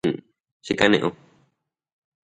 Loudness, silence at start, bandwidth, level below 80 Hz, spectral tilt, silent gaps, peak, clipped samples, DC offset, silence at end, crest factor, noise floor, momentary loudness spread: -22 LUFS; 0.05 s; 10.5 kHz; -58 dBFS; -5 dB/octave; 0.40-0.44 s, 0.52-0.60 s; 0 dBFS; under 0.1%; under 0.1%; 1.25 s; 26 dB; -73 dBFS; 17 LU